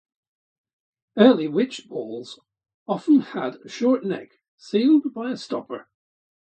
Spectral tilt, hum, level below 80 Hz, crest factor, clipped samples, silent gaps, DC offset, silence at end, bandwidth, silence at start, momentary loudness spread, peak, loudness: -6.5 dB/octave; none; -76 dBFS; 22 dB; under 0.1%; 2.74-2.86 s, 4.48-4.58 s; under 0.1%; 0.75 s; 8.8 kHz; 1.15 s; 18 LU; -2 dBFS; -22 LUFS